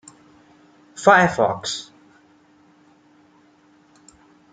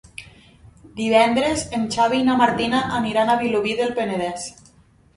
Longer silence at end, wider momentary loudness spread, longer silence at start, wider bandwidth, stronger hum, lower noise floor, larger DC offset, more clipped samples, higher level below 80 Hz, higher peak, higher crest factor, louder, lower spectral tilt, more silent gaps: first, 2.7 s vs 0.65 s; about the same, 16 LU vs 15 LU; first, 0.95 s vs 0.2 s; second, 9.4 kHz vs 11.5 kHz; neither; about the same, -55 dBFS vs -54 dBFS; neither; neither; second, -62 dBFS vs -50 dBFS; about the same, -2 dBFS vs -2 dBFS; about the same, 22 dB vs 20 dB; about the same, -18 LUFS vs -20 LUFS; about the same, -4 dB/octave vs -4.5 dB/octave; neither